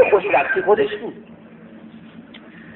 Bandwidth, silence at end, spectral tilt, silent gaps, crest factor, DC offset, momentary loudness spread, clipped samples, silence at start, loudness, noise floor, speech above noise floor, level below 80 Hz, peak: 4.1 kHz; 0 s; -2.5 dB/octave; none; 18 dB; under 0.1%; 25 LU; under 0.1%; 0 s; -18 LUFS; -42 dBFS; 23 dB; -60 dBFS; -2 dBFS